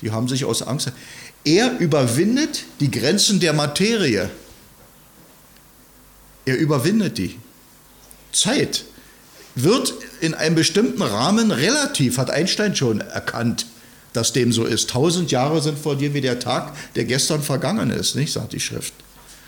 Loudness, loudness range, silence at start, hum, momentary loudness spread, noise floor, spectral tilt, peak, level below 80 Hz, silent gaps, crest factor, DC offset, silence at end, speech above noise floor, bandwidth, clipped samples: -20 LUFS; 6 LU; 0 s; none; 9 LU; -49 dBFS; -4 dB/octave; -4 dBFS; -54 dBFS; none; 16 dB; under 0.1%; 0.1 s; 29 dB; 19.5 kHz; under 0.1%